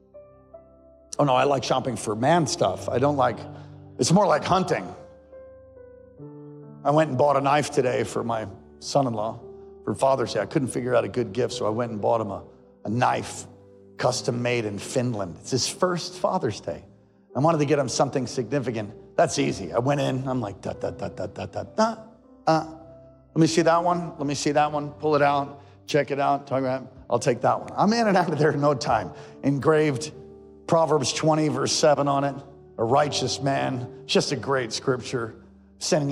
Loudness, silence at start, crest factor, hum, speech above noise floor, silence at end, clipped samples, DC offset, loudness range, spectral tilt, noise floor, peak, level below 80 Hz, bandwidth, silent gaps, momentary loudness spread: -24 LUFS; 0.15 s; 16 dB; none; 29 dB; 0 s; under 0.1%; under 0.1%; 4 LU; -5 dB/octave; -53 dBFS; -10 dBFS; -60 dBFS; 13.5 kHz; none; 15 LU